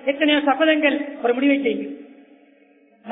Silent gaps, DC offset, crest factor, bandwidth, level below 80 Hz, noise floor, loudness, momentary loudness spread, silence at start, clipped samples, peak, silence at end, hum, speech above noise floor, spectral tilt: none; under 0.1%; 18 dB; 3.9 kHz; -64 dBFS; -55 dBFS; -19 LUFS; 12 LU; 0 s; under 0.1%; -4 dBFS; 0 s; none; 36 dB; -7.5 dB/octave